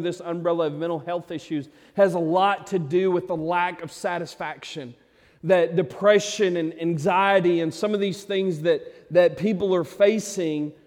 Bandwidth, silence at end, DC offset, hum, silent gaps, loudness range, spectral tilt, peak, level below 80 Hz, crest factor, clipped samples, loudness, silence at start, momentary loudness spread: 15.5 kHz; 0.15 s; under 0.1%; none; none; 3 LU; -5.5 dB/octave; -6 dBFS; -66 dBFS; 18 dB; under 0.1%; -23 LUFS; 0 s; 12 LU